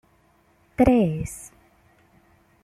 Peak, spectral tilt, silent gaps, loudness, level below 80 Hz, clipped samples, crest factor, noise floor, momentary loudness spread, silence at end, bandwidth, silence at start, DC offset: -6 dBFS; -7.5 dB/octave; none; -22 LUFS; -44 dBFS; under 0.1%; 20 dB; -61 dBFS; 22 LU; 1.15 s; 14 kHz; 0.8 s; under 0.1%